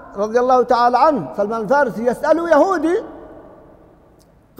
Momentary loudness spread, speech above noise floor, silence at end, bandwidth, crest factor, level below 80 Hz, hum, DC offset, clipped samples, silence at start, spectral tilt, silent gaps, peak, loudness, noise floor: 8 LU; 35 dB; 1.2 s; 15 kHz; 14 dB; -52 dBFS; none; under 0.1%; under 0.1%; 0 s; -6 dB/octave; none; -2 dBFS; -16 LUFS; -50 dBFS